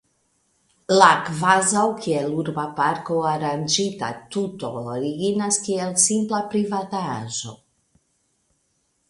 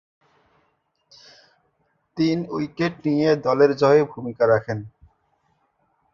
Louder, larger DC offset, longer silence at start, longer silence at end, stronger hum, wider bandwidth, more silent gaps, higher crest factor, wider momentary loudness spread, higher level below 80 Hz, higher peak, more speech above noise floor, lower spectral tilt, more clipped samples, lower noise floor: about the same, -21 LUFS vs -21 LUFS; neither; second, 0.9 s vs 2.15 s; first, 1.55 s vs 1.25 s; neither; first, 11.5 kHz vs 7.2 kHz; neither; about the same, 22 dB vs 18 dB; about the same, 12 LU vs 14 LU; about the same, -64 dBFS vs -60 dBFS; first, 0 dBFS vs -4 dBFS; about the same, 48 dB vs 49 dB; second, -3.5 dB/octave vs -7.5 dB/octave; neither; about the same, -69 dBFS vs -69 dBFS